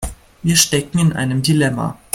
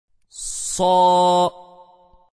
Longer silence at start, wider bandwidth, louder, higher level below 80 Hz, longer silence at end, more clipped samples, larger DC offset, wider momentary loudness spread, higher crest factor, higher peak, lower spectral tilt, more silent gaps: second, 0 s vs 0.35 s; first, 16.5 kHz vs 11 kHz; about the same, -16 LUFS vs -18 LUFS; first, -38 dBFS vs -50 dBFS; second, 0.2 s vs 0.7 s; neither; neither; about the same, 11 LU vs 13 LU; about the same, 18 dB vs 14 dB; first, 0 dBFS vs -6 dBFS; about the same, -4 dB/octave vs -4 dB/octave; neither